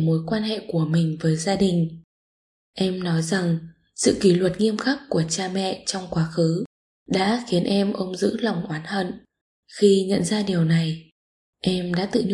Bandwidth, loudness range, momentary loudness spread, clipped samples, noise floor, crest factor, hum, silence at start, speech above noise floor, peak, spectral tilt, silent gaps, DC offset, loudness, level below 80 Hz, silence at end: 11.5 kHz; 2 LU; 9 LU; under 0.1%; under -90 dBFS; 18 dB; none; 0 s; over 68 dB; -4 dBFS; -5.5 dB/octave; 2.04-2.73 s, 6.66-7.06 s, 9.41-9.63 s, 11.12-11.53 s; under 0.1%; -23 LUFS; -56 dBFS; 0 s